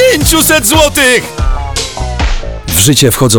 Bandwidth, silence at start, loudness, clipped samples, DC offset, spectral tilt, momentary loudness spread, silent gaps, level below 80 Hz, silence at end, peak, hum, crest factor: over 20 kHz; 0 s; -9 LUFS; under 0.1%; under 0.1%; -3 dB/octave; 10 LU; none; -18 dBFS; 0 s; 0 dBFS; none; 8 dB